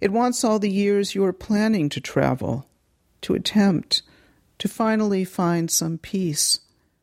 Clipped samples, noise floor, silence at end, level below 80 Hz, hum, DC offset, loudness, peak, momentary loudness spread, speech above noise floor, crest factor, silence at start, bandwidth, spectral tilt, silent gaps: under 0.1%; -64 dBFS; 0.45 s; -54 dBFS; none; under 0.1%; -22 LUFS; -6 dBFS; 7 LU; 43 dB; 16 dB; 0 s; 15.5 kHz; -4.5 dB/octave; none